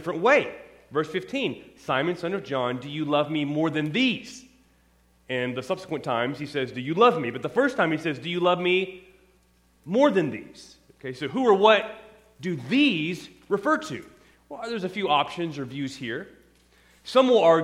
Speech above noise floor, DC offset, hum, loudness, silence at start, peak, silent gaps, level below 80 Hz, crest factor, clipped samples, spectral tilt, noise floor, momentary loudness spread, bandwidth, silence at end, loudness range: 38 dB; under 0.1%; none; -25 LUFS; 0 s; -4 dBFS; none; -66 dBFS; 22 dB; under 0.1%; -5.5 dB/octave; -62 dBFS; 16 LU; 13.5 kHz; 0 s; 5 LU